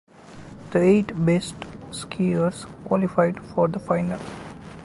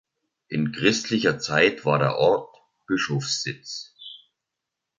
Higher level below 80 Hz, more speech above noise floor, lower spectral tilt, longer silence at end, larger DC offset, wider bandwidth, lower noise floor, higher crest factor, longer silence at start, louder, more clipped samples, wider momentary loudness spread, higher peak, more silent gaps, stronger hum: first, -52 dBFS vs -62 dBFS; second, 20 dB vs 61 dB; first, -7 dB/octave vs -4.5 dB/octave; second, 0 s vs 0.8 s; neither; first, 11.5 kHz vs 9.6 kHz; second, -43 dBFS vs -84 dBFS; about the same, 18 dB vs 22 dB; second, 0.3 s vs 0.5 s; about the same, -23 LUFS vs -23 LUFS; neither; first, 19 LU vs 15 LU; about the same, -6 dBFS vs -4 dBFS; neither; neither